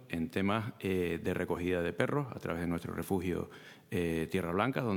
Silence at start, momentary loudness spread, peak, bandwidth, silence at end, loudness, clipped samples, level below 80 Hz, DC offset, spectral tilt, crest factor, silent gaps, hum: 0 s; 6 LU; -10 dBFS; 19 kHz; 0 s; -34 LUFS; under 0.1%; -62 dBFS; under 0.1%; -6.5 dB/octave; 24 dB; none; none